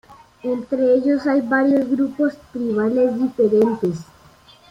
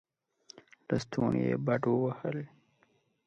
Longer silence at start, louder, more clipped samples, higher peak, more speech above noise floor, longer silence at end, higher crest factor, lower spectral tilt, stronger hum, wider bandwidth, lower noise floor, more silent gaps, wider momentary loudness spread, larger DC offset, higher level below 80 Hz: second, 0.1 s vs 0.55 s; first, -19 LUFS vs -32 LUFS; neither; first, -6 dBFS vs -14 dBFS; second, 31 dB vs 41 dB; second, 0.65 s vs 0.8 s; second, 14 dB vs 20 dB; about the same, -8 dB/octave vs -7.5 dB/octave; neither; second, 7.6 kHz vs 8.6 kHz; second, -49 dBFS vs -71 dBFS; neither; second, 9 LU vs 13 LU; neither; first, -58 dBFS vs -64 dBFS